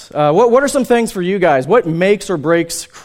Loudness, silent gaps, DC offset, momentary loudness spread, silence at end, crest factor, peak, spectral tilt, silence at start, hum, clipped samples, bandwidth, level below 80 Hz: -13 LUFS; none; under 0.1%; 5 LU; 0.05 s; 14 dB; 0 dBFS; -5 dB/octave; 0 s; none; under 0.1%; 16 kHz; -48 dBFS